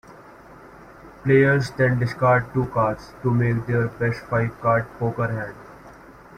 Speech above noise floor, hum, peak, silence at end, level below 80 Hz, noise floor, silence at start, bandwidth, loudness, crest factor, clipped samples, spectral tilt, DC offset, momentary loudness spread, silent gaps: 24 dB; none; -4 dBFS; 0.25 s; -50 dBFS; -45 dBFS; 0.1 s; 9.8 kHz; -22 LUFS; 18 dB; under 0.1%; -8 dB/octave; under 0.1%; 9 LU; none